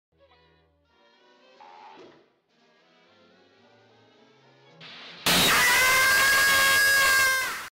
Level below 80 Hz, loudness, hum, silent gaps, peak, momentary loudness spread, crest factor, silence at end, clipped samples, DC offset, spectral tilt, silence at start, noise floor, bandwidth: -56 dBFS; -19 LUFS; none; none; -14 dBFS; 9 LU; 12 dB; 0.05 s; under 0.1%; under 0.1%; -0.5 dB/octave; 4.8 s; -65 dBFS; 16.5 kHz